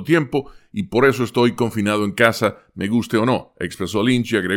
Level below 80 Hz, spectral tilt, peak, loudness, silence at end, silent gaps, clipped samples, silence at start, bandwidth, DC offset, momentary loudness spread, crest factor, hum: -52 dBFS; -5.5 dB/octave; 0 dBFS; -19 LUFS; 0 s; none; under 0.1%; 0 s; 17 kHz; under 0.1%; 10 LU; 18 dB; none